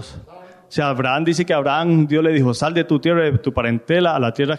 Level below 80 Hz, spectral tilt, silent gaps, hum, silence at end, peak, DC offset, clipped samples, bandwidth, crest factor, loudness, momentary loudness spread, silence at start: -46 dBFS; -6.5 dB/octave; none; none; 0 s; -6 dBFS; under 0.1%; under 0.1%; 11.5 kHz; 12 dB; -18 LUFS; 5 LU; 0 s